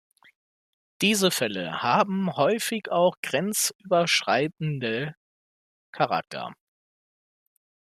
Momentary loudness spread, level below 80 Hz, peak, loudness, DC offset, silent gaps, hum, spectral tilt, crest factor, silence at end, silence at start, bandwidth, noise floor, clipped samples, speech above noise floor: 8 LU; -70 dBFS; -6 dBFS; -24 LUFS; under 0.1%; 3.17-3.23 s, 3.75-3.79 s, 5.17-5.93 s; none; -3.5 dB/octave; 20 dB; 1.45 s; 1 s; 14.5 kHz; under -90 dBFS; under 0.1%; over 65 dB